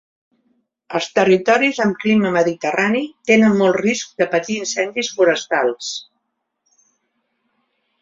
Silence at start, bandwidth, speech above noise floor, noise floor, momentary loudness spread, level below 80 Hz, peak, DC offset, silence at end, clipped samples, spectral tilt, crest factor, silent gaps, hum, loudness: 0.9 s; 7.8 kHz; 57 dB; -74 dBFS; 8 LU; -62 dBFS; 0 dBFS; under 0.1%; 2 s; under 0.1%; -4.5 dB/octave; 18 dB; none; none; -17 LUFS